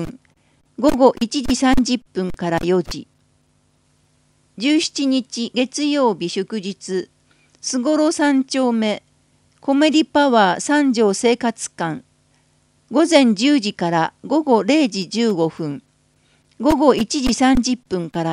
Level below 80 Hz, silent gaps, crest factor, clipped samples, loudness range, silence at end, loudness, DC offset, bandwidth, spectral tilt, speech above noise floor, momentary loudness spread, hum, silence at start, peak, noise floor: -40 dBFS; none; 18 dB; under 0.1%; 5 LU; 0 s; -18 LUFS; under 0.1%; 13.5 kHz; -4.5 dB/octave; 43 dB; 11 LU; none; 0 s; 0 dBFS; -61 dBFS